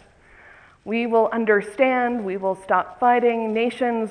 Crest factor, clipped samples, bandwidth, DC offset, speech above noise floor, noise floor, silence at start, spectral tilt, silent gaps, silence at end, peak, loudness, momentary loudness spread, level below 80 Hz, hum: 18 dB; under 0.1%; 10.5 kHz; under 0.1%; 29 dB; -50 dBFS; 0.85 s; -6 dB/octave; none; 0 s; -4 dBFS; -21 LUFS; 7 LU; -62 dBFS; none